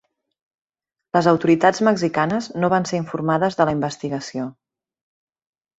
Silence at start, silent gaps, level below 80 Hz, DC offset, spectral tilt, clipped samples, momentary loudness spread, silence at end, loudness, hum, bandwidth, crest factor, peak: 1.15 s; none; -58 dBFS; under 0.1%; -6 dB/octave; under 0.1%; 11 LU; 1.25 s; -20 LUFS; none; 8 kHz; 20 dB; -2 dBFS